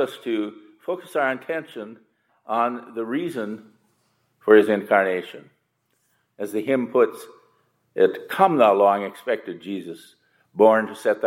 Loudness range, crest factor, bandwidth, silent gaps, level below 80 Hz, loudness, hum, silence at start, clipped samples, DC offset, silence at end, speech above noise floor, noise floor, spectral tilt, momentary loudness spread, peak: 7 LU; 20 dB; 16 kHz; none; -80 dBFS; -22 LUFS; none; 0 s; under 0.1%; under 0.1%; 0 s; 49 dB; -71 dBFS; -6 dB/octave; 21 LU; -2 dBFS